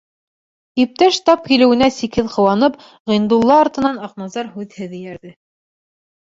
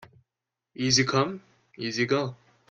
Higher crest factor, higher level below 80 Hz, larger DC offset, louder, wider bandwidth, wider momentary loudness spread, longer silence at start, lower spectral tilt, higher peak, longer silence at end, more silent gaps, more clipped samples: second, 16 dB vs 22 dB; first, -50 dBFS vs -64 dBFS; neither; first, -15 LUFS vs -26 LUFS; second, 7.8 kHz vs 11 kHz; first, 17 LU vs 14 LU; about the same, 0.75 s vs 0.8 s; first, -5 dB/octave vs -3.5 dB/octave; first, 0 dBFS vs -8 dBFS; first, 1 s vs 0.35 s; first, 3.00-3.05 s vs none; neither